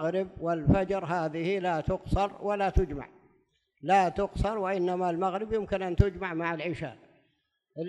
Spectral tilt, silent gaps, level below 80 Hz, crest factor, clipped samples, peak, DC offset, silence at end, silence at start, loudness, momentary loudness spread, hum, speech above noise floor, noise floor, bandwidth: -7.5 dB/octave; none; -40 dBFS; 24 dB; under 0.1%; -6 dBFS; under 0.1%; 0 s; 0 s; -29 LUFS; 9 LU; none; 47 dB; -75 dBFS; 11.5 kHz